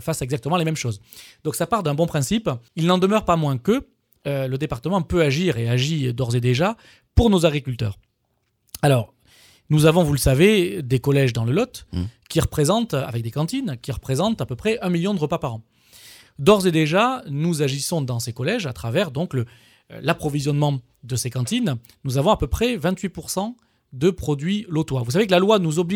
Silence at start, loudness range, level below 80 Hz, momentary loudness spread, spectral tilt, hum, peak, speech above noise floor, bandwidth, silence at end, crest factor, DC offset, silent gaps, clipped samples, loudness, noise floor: 0 s; 5 LU; -40 dBFS; 11 LU; -6 dB/octave; none; -2 dBFS; 50 dB; 17.5 kHz; 0 s; 20 dB; under 0.1%; none; under 0.1%; -21 LUFS; -70 dBFS